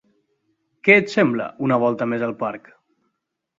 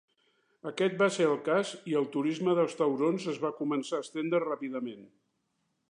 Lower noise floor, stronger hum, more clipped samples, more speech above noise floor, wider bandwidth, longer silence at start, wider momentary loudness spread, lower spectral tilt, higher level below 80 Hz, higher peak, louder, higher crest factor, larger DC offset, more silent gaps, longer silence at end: about the same, -77 dBFS vs -78 dBFS; neither; neither; first, 57 dB vs 48 dB; second, 7.8 kHz vs 11 kHz; first, 0.85 s vs 0.65 s; first, 14 LU vs 9 LU; about the same, -6.5 dB/octave vs -5.5 dB/octave; first, -66 dBFS vs -86 dBFS; first, 0 dBFS vs -14 dBFS; first, -19 LUFS vs -30 LUFS; about the same, 22 dB vs 18 dB; neither; neither; first, 1 s vs 0.85 s